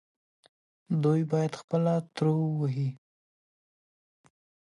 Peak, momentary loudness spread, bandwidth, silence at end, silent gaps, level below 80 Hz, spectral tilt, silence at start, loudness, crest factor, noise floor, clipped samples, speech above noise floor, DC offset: -14 dBFS; 6 LU; 11 kHz; 1.8 s; 1.64-1.68 s; -76 dBFS; -8.5 dB/octave; 0.9 s; -29 LUFS; 16 dB; under -90 dBFS; under 0.1%; over 63 dB; under 0.1%